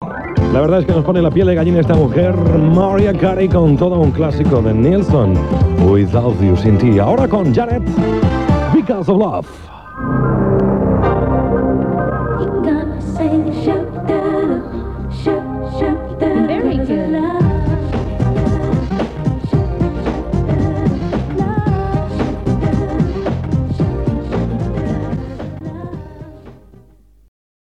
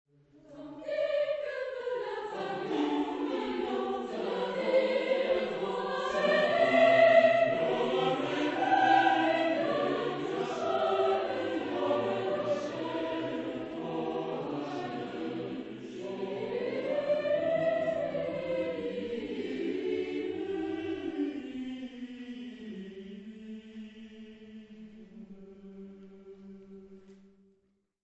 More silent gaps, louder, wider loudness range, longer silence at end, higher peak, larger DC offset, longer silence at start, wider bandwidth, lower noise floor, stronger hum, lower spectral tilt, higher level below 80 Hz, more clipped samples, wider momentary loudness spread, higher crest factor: neither; first, -15 LUFS vs -30 LUFS; second, 6 LU vs 20 LU; first, 1.1 s vs 0.9 s; first, -4 dBFS vs -10 dBFS; first, 0.2% vs under 0.1%; second, 0 s vs 0.5 s; about the same, 8.6 kHz vs 8.2 kHz; second, -47 dBFS vs -74 dBFS; neither; first, -9.5 dB/octave vs -5.5 dB/octave; first, -26 dBFS vs -70 dBFS; neither; second, 9 LU vs 23 LU; second, 10 dB vs 22 dB